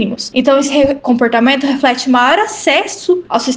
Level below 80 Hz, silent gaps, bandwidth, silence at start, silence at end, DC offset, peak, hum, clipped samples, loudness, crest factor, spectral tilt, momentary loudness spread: -48 dBFS; none; 9.8 kHz; 0 s; 0 s; under 0.1%; 0 dBFS; none; under 0.1%; -12 LUFS; 12 dB; -3.5 dB/octave; 4 LU